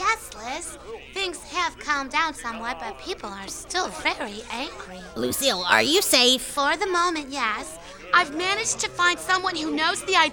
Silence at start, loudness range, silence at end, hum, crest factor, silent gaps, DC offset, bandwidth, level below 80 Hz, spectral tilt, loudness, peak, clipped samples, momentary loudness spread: 0 s; 7 LU; 0 s; none; 22 dB; none; under 0.1%; 19 kHz; -52 dBFS; -1 dB/octave; -23 LUFS; -2 dBFS; under 0.1%; 15 LU